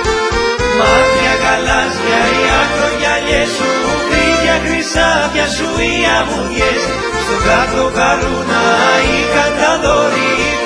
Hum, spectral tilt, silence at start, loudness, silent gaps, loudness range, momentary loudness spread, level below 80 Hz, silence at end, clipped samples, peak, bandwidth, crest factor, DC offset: none; -3.5 dB/octave; 0 s; -12 LUFS; none; 1 LU; 4 LU; -28 dBFS; 0 s; under 0.1%; 0 dBFS; 11 kHz; 12 dB; under 0.1%